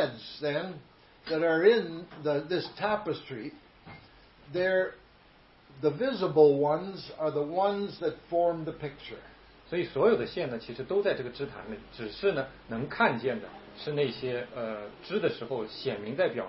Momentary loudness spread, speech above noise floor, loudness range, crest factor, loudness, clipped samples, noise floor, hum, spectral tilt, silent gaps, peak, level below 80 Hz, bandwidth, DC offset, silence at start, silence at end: 16 LU; 29 dB; 5 LU; 22 dB; -30 LUFS; under 0.1%; -58 dBFS; none; -9.5 dB/octave; none; -8 dBFS; -62 dBFS; 5.8 kHz; under 0.1%; 0 s; 0 s